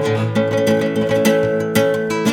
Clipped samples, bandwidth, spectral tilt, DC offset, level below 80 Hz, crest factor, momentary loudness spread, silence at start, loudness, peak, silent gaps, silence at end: under 0.1%; over 20 kHz; -5.5 dB/octave; under 0.1%; -52 dBFS; 14 dB; 3 LU; 0 s; -17 LUFS; -2 dBFS; none; 0 s